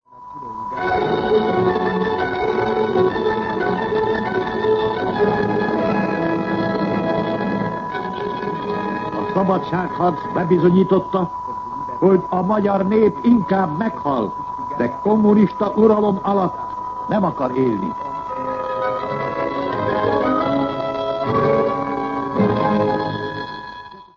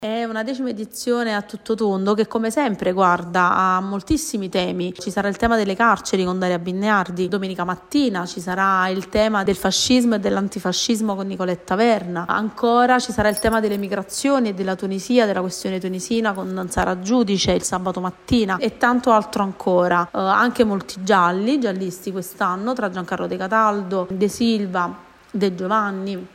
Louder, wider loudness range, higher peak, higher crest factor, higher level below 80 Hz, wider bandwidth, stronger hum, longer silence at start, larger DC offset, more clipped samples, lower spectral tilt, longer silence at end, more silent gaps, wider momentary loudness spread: about the same, -19 LUFS vs -20 LUFS; about the same, 4 LU vs 2 LU; about the same, -2 dBFS vs -4 dBFS; about the same, 16 dB vs 16 dB; about the same, -48 dBFS vs -46 dBFS; second, 7 kHz vs 16 kHz; neither; about the same, 0.1 s vs 0 s; neither; neither; first, -8.5 dB/octave vs -4.5 dB/octave; about the same, 0.15 s vs 0.05 s; neither; about the same, 10 LU vs 8 LU